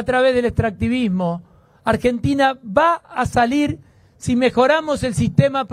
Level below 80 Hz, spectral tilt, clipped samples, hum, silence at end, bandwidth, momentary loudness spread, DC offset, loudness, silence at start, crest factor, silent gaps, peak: -42 dBFS; -6 dB/octave; under 0.1%; none; 0 s; 14 kHz; 7 LU; under 0.1%; -18 LUFS; 0 s; 18 dB; none; 0 dBFS